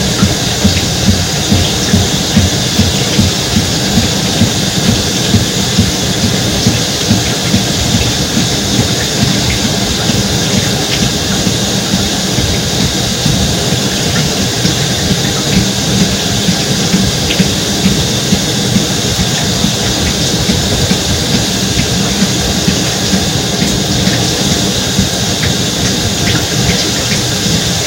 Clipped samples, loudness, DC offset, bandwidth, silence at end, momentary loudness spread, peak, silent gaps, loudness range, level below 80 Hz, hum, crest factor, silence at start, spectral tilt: 0.1%; -11 LUFS; under 0.1%; 17 kHz; 0 s; 1 LU; 0 dBFS; none; 1 LU; -26 dBFS; none; 12 dB; 0 s; -3.5 dB/octave